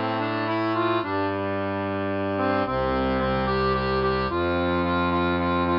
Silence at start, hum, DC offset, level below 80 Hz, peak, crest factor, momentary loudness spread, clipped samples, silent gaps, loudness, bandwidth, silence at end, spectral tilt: 0 s; none; under 0.1%; -42 dBFS; -12 dBFS; 12 dB; 4 LU; under 0.1%; none; -24 LUFS; 5.6 kHz; 0 s; -9 dB/octave